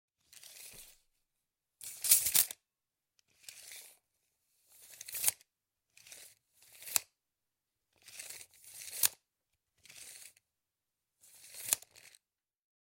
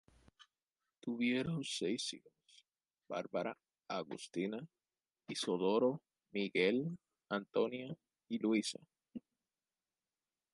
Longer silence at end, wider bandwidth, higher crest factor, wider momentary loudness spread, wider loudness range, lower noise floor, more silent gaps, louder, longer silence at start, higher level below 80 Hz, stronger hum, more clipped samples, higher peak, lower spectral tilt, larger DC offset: second, 1.2 s vs 1.35 s; first, 17 kHz vs 11.5 kHz; first, 34 dB vs 20 dB; first, 26 LU vs 19 LU; first, 10 LU vs 6 LU; about the same, under -90 dBFS vs under -90 dBFS; neither; first, -31 LUFS vs -39 LUFS; about the same, 0.45 s vs 0.4 s; about the same, -78 dBFS vs -80 dBFS; neither; neither; first, -6 dBFS vs -20 dBFS; second, 2.5 dB/octave vs -4.5 dB/octave; neither